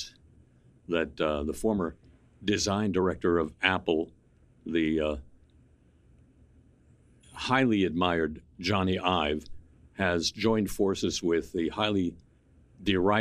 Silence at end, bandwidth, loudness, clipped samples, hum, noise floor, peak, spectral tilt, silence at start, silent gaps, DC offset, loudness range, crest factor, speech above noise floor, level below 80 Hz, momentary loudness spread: 0 s; 15.5 kHz; -28 LUFS; under 0.1%; none; -61 dBFS; -6 dBFS; -5 dB/octave; 0 s; none; under 0.1%; 4 LU; 24 dB; 33 dB; -50 dBFS; 10 LU